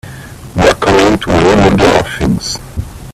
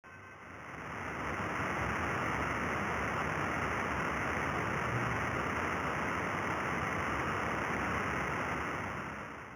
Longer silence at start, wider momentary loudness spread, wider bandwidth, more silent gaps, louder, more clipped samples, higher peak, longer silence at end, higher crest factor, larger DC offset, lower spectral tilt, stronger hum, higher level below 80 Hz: about the same, 0.05 s vs 0.05 s; first, 17 LU vs 7 LU; second, 15 kHz vs over 20 kHz; neither; first, -10 LUFS vs -35 LUFS; neither; first, 0 dBFS vs -20 dBFS; about the same, 0 s vs 0 s; second, 10 dB vs 16 dB; neither; about the same, -5 dB/octave vs -5 dB/octave; neither; first, -26 dBFS vs -52 dBFS